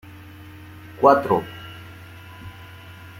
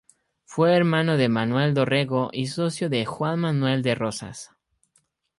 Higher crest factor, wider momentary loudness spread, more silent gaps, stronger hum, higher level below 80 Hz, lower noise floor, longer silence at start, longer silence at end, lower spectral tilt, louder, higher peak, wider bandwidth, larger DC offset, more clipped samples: first, 22 dB vs 16 dB; first, 25 LU vs 9 LU; neither; neither; about the same, -58 dBFS vs -62 dBFS; second, -42 dBFS vs -68 dBFS; first, 0.9 s vs 0.5 s; second, 0 s vs 0.95 s; about the same, -7 dB/octave vs -6 dB/octave; first, -19 LUFS vs -23 LUFS; first, -2 dBFS vs -8 dBFS; first, 16.5 kHz vs 11.5 kHz; neither; neither